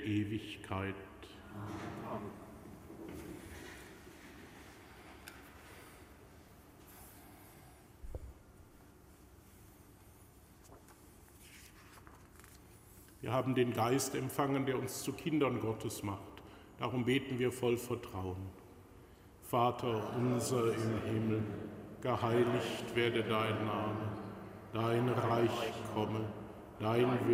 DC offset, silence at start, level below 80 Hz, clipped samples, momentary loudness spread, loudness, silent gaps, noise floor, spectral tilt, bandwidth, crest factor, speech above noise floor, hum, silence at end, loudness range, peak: under 0.1%; 0 s; -62 dBFS; under 0.1%; 24 LU; -36 LUFS; none; -60 dBFS; -5.5 dB/octave; 16 kHz; 20 dB; 25 dB; none; 0 s; 21 LU; -18 dBFS